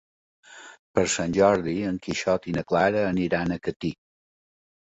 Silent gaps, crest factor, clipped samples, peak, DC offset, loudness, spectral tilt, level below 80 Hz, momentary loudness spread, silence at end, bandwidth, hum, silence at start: 0.79-0.94 s, 3.76-3.80 s; 20 dB; under 0.1%; -6 dBFS; under 0.1%; -25 LUFS; -5 dB/octave; -52 dBFS; 11 LU; 0.9 s; 8.4 kHz; none; 0.5 s